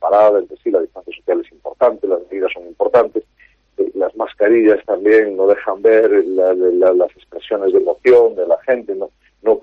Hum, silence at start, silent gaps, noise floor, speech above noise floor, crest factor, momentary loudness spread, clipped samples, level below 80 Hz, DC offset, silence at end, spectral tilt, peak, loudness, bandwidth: none; 0 s; none; -53 dBFS; 39 dB; 12 dB; 12 LU; under 0.1%; -58 dBFS; under 0.1%; 0.05 s; -7 dB/octave; -2 dBFS; -15 LUFS; 5.2 kHz